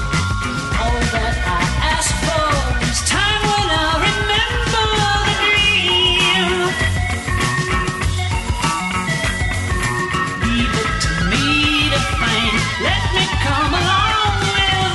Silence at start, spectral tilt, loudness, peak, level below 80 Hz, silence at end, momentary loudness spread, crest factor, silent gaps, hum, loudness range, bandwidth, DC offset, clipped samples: 0 s; -3.5 dB/octave; -16 LUFS; -4 dBFS; -26 dBFS; 0 s; 6 LU; 14 dB; none; none; 4 LU; 12 kHz; under 0.1%; under 0.1%